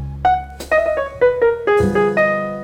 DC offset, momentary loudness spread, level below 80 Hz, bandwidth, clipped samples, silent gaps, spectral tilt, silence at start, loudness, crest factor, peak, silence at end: under 0.1%; 4 LU; -36 dBFS; 16 kHz; under 0.1%; none; -6.5 dB/octave; 0 s; -17 LUFS; 12 dB; -4 dBFS; 0 s